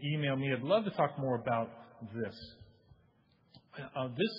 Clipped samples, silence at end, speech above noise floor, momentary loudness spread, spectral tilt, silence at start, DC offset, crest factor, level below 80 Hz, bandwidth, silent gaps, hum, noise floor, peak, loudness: under 0.1%; 0 s; 35 dB; 20 LU; -5 dB/octave; 0 s; under 0.1%; 20 dB; -72 dBFS; 5.6 kHz; none; none; -69 dBFS; -16 dBFS; -35 LUFS